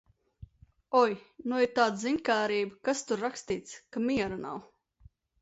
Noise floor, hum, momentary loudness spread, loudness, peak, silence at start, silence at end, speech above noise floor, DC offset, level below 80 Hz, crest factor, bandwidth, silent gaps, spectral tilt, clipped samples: -60 dBFS; none; 12 LU; -30 LUFS; -10 dBFS; 0.4 s; 0.75 s; 31 dB; under 0.1%; -64 dBFS; 20 dB; 8 kHz; none; -4 dB/octave; under 0.1%